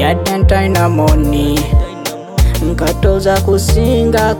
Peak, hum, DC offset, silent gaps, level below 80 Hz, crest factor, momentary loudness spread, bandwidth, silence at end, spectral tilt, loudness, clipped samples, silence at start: 0 dBFS; none; under 0.1%; none; -16 dBFS; 12 dB; 4 LU; 19 kHz; 0 s; -6 dB/octave; -13 LUFS; under 0.1%; 0 s